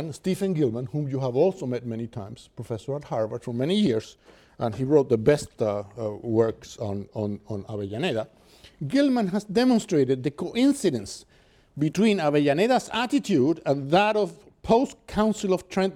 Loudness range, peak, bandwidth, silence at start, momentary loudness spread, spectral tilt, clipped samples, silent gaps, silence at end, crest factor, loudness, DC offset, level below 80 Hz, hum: 5 LU; -6 dBFS; 14.5 kHz; 0 s; 12 LU; -6 dB/octave; under 0.1%; none; 0 s; 18 dB; -25 LUFS; under 0.1%; -56 dBFS; none